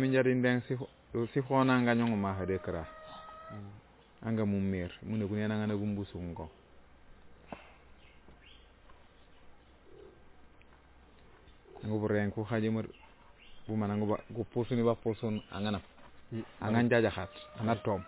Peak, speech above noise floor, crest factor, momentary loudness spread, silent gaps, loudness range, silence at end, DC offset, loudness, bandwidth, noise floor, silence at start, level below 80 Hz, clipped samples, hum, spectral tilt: -16 dBFS; 27 dB; 18 dB; 19 LU; none; 8 LU; 0 s; under 0.1%; -33 LUFS; 4 kHz; -59 dBFS; 0 s; -58 dBFS; under 0.1%; none; -6.5 dB/octave